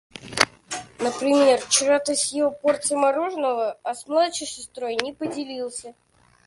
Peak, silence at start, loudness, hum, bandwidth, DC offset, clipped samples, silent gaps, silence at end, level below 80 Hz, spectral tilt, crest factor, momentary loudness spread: 0 dBFS; 0.15 s; -23 LUFS; none; 11.5 kHz; under 0.1%; under 0.1%; none; 0.55 s; -64 dBFS; -1.5 dB/octave; 24 dB; 14 LU